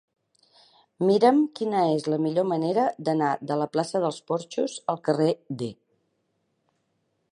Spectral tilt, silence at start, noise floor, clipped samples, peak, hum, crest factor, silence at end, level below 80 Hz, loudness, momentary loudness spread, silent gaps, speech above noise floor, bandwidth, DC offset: -6.5 dB/octave; 1 s; -74 dBFS; under 0.1%; -6 dBFS; none; 20 dB; 1.6 s; -76 dBFS; -25 LUFS; 10 LU; none; 50 dB; 11 kHz; under 0.1%